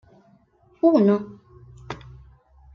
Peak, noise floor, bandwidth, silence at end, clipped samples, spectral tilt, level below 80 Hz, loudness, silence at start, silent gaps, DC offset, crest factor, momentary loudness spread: -6 dBFS; -58 dBFS; 6.8 kHz; 0.8 s; under 0.1%; -9 dB/octave; -54 dBFS; -20 LUFS; 0.85 s; none; under 0.1%; 18 dB; 21 LU